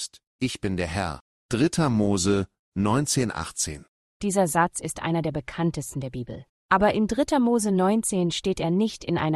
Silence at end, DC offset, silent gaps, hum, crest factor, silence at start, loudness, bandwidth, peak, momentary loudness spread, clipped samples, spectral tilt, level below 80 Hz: 0 s; under 0.1%; 0.27-0.39 s, 1.21-1.49 s, 2.59-2.72 s, 3.88-4.20 s, 6.49-6.69 s; none; 20 dB; 0 s; -25 LUFS; 12.5 kHz; -6 dBFS; 11 LU; under 0.1%; -5 dB/octave; -50 dBFS